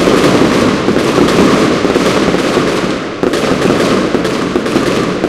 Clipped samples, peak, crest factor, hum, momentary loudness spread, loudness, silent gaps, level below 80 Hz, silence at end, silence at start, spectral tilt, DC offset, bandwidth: 0.4%; 0 dBFS; 10 dB; none; 5 LU; -11 LUFS; none; -34 dBFS; 0 s; 0 s; -5 dB/octave; under 0.1%; 16 kHz